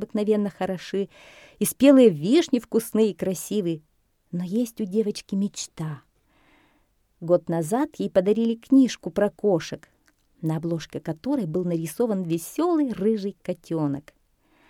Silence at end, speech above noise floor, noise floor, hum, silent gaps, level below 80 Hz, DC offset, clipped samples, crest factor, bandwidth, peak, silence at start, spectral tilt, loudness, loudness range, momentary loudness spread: 0.7 s; 42 dB; -66 dBFS; none; none; -62 dBFS; under 0.1%; under 0.1%; 18 dB; 17.5 kHz; -6 dBFS; 0 s; -6 dB/octave; -24 LUFS; 7 LU; 13 LU